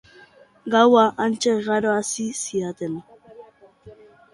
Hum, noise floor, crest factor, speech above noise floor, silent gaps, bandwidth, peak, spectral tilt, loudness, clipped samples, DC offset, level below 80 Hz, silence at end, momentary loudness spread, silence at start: none; -51 dBFS; 20 dB; 31 dB; none; 11.5 kHz; -2 dBFS; -4 dB/octave; -20 LUFS; under 0.1%; under 0.1%; -64 dBFS; 0.4 s; 16 LU; 0.65 s